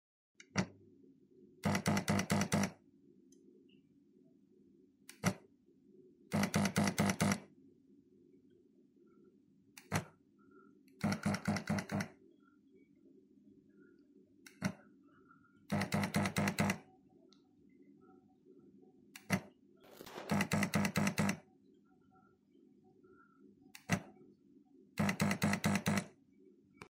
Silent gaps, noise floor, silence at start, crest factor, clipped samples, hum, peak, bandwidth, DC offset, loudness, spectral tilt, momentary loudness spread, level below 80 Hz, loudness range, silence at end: none; -68 dBFS; 0.55 s; 24 dB; under 0.1%; none; -16 dBFS; 16 kHz; under 0.1%; -37 LUFS; -5 dB/octave; 21 LU; -72 dBFS; 10 LU; 0.05 s